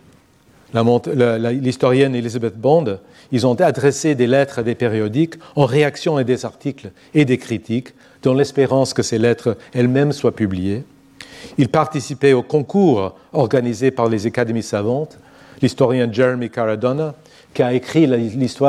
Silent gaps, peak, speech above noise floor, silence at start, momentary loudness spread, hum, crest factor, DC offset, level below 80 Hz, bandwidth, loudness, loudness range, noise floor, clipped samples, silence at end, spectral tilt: none; -2 dBFS; 34 dB; 0.75 s; 8 LU; none; 16 dB; under 0.1%; -56 dBFS; 13 kHz; -18 LUFS; 2 LU; -51 dBFS; under 0.1%; 0 s; -6.5 dB/octave